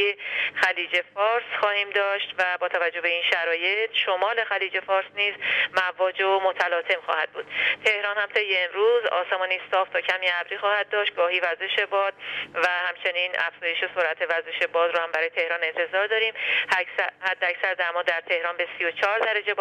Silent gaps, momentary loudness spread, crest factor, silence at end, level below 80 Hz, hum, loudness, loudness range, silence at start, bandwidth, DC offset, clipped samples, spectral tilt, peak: none; 4 LU; 18 dB; 0 s; -80 dBFS; none; -24 LUFS; 1 LU; 0 s; 12.5 kHz; under 0.1%; under 0.1%; -1.5 dB/octave; -6 dBFS